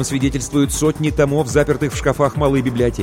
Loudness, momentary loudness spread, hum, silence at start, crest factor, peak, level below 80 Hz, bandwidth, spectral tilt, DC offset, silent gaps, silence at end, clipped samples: -17 LUFS; 3 LU; none; 0 s; 14 dB; -2 dBFS; -32 dBFS; 16.5 kHz; -5.5 dB/octave; under 0.1%; none; 0 s; under 0.1%